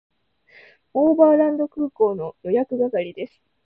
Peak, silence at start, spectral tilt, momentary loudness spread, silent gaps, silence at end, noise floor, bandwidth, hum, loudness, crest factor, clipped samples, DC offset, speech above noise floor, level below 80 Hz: -4 dBFS; 0.95 s; -10.5 dB/octave; 15 LU; none; 0.4 s; -54 dBFS; 4 kHz; none; -20 LUFS; 18 dB; under 0.1%; under 0.1%; 34 dB; -66 dBFS